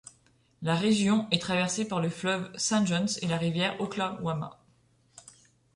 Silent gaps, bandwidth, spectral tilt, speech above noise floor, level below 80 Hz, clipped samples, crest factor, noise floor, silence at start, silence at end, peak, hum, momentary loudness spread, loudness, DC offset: none; 11.5 kHz; -4.5 dB/octave; 37 dB; -64 dBFS; under 0.1%; 22 dB; -65 dBFS; 0.6 s; 0.55 s; -8 dBFS; none; 8 LU; -28 LUFS; under 0.1%